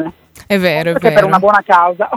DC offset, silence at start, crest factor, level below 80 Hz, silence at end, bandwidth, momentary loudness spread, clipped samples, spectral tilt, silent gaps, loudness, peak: under 0.1%; 0 s; 12 dB; -50 dBFS; 0 s; 16 kHz; 6 LU; 0.3%; -6 dB/octave; none; -11 LUFS; 0 dBFS